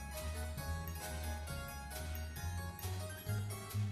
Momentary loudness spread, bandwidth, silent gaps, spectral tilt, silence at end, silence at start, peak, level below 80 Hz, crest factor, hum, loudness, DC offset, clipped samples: 3 LU; 14 kHz; none; -4.5 dB/octave; 0 s; 0 s; -28 dBFS; -48 dBFS; 14 dB; none; -43 LUFS; under 0.1%; under 0.1%